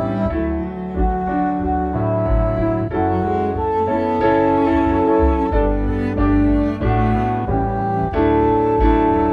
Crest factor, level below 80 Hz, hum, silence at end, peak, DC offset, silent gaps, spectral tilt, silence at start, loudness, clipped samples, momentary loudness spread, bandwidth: 14 dB; -26 dBFS; none; 0 s; -2 dBFS; under 0.1%; none; -10 dB/octave; 0 s; -18 LUFS; under 0.1%; 5 LU; 5.2 kHz